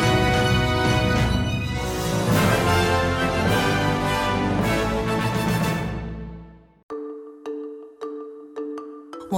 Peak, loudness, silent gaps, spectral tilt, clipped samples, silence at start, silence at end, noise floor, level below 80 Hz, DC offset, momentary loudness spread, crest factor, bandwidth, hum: -8 dBFS; -22 LUFS; 6.83-6.89 s; -5.5 dB/octave; under 0.1%; 0 s; 0 s; -43 dBFS; -36 dBFS; under 0.1%; 17 LU; 14 dB; 17 kHz; none